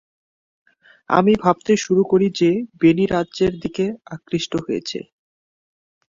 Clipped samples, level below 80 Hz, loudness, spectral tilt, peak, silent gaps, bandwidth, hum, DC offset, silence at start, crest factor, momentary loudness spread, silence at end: under 0.1%; -54 dBFS; -19 LUFS; -6 dB/octave; -2 dBFS; none; 7.6 kHz; none; under 0.1%; 1.1 s; 18 dB; 9 LU; 1.1 s